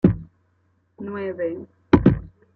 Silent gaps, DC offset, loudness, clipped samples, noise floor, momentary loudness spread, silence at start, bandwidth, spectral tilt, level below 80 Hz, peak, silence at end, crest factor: none; under 0.1%; -22 LUFS; under 0.1%; -65 dBFS; 17 LU; 0.05 s; 6 kHz; -10.5 dB/octave; -38 dBFS; -2 dBFS; 0.3 s; 20 dB